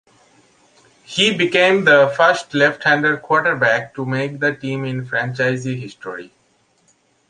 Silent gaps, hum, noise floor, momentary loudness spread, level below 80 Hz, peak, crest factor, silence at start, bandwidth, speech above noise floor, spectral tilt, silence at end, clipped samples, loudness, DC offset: none; none; -60 dBFS; 14 LU; -64 dBFS; 0 dBFS; 18 dB; 1.1 s; 10 kHz; 43 dB; -4.5 dB/octave; 1.05 s; under 0.1%; -17 LUFS; under 0.1%